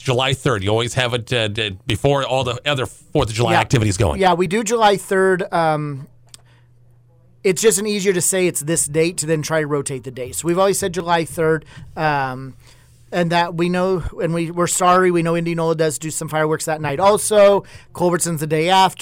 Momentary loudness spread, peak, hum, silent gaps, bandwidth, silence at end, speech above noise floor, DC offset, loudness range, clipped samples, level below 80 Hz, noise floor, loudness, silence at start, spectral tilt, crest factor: 8 LU; -6 dBFS; none; none; 16.5 kHz; 0.1 s; 33 dB; under 0.1%; 3 LU; under 0.1%; -42 dBFS; -51 dBFS; -18 LUFS; 0 s; -4 dB/octave; 14 dB